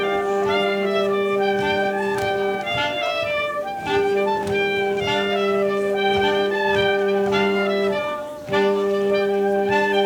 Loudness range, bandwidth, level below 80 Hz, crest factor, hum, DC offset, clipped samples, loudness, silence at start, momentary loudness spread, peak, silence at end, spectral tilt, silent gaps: 2 LU; 18.5 kHz; -54 dBFS; 14 dB; none; under 0.1%; under 0.1%; -21 LUFS; 0 s; 3 LU; -6 dBFS; 0 s; -5 dB/octave; none